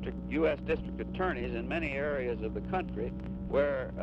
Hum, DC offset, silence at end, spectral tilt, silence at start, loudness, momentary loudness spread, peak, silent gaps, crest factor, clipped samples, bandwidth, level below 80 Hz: none; under 0.1%; 0 s; -8.5 dB/octave; 0 s; -33 LUFS; 7 LU; -16 dBFS; none; 16 dB; under 0.1%; 7.6 kHz; -44 dBFS